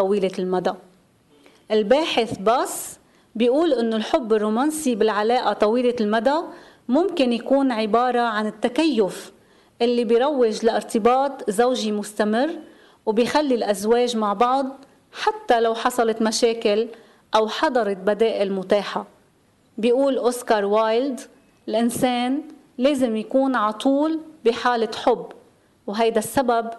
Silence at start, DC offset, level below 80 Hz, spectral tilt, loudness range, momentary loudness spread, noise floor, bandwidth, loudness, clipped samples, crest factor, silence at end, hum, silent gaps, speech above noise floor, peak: 0 s; under 0.1%; -60 dBFS; -4.5 dB/octave; 2 LU; 8 LU; -59 dBFS; 12 kHz; -21 LUFS; under 0.1%; 16 dB; 0 s; none; none; 39 dB; -6 dBFS